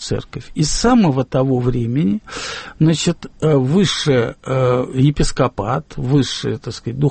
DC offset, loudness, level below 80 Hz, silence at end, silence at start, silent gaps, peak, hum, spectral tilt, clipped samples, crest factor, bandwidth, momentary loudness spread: under 0.1%; -17 LUFS; -32 dBFS; 0 s; 0 s; none; -4 dBFS; none; -6 dB/octave; under 0.1%; 14 dB; 8.8 kHz; 10 LU